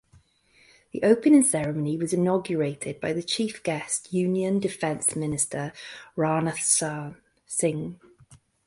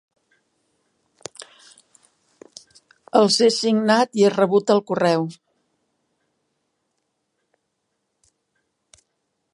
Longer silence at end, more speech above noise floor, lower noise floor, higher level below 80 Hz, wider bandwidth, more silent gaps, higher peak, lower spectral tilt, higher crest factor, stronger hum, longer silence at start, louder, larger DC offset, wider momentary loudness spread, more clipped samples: second, 0.7 s vs 4.2 s; second, 36 dB vs 58 dB; second, -61 dBFS vs -75 dBFS; first, -62 dBFS vs -74 dBFS; about the same, 12 kHz vs 11.5 kHz; neither; second, -6 dBFS vs -2 dBFS; about the same, -4.5 dB/octave vs -4.5 dB/octave; about the same, 20 dB vs 22 dB; neither; second, 0.95 s vs 1.4 s; second, -25 LUFS vs -18 LUFS; neither; second, 14 LU vs 22 LU; neither